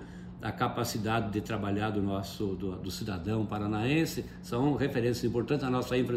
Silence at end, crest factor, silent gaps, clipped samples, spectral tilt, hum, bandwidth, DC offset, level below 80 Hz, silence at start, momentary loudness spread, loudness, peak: 0 s; 16 dB; none; under 0.1%; -6 dB/octave; none; 16 kHz; under 0.1%; -52 dBFS; 0 s; 8 LU; -32 LUFS; -16 dBFS